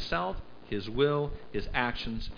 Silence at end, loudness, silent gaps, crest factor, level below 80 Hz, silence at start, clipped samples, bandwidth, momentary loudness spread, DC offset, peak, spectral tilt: 0 s; -32 LUFS; none; 20 dB; -42 dBFS; 0 s; under 0.1%; 5.2 kHz; 10 LU; under 0.1%; -10 dBFS; -6.5 dB/octave